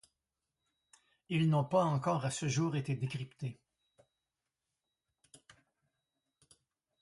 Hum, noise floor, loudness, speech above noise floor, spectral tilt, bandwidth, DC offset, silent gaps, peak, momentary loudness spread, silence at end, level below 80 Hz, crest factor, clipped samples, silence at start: none; -89 dBFS; -34 LUFS; 56 dB; -6 dB/octave; 11.5 kHz; under 0.1%; none; -18 dBFS; 12 LU; 3.5 s; -74 dBFS; 20 dB; under 0.1%; 1.3 s